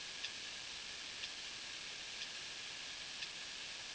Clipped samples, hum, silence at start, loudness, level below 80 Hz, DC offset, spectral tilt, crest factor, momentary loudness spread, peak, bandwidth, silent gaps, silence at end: under 0.1%; none; 0 s; -45 LUFS; -74 dBFS; under 0.1%; 0.5 dB/octave; 20 dB; 1 LU; -28 dBFS; 8 kHz; none; 0 s